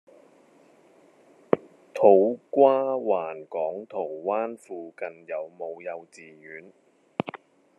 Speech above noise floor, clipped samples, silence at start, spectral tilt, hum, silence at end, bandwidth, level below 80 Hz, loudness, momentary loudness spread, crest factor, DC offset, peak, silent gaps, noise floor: 32 dB; under 0.1%; 1.55 s; -7.5 dB/octave; none; 0.45 s; 9.8 kHz; -82 dBFS; -25 LUFS; 21 LU; 26 dB; under 0.1%; -2 dBFS; none; -57 dBFS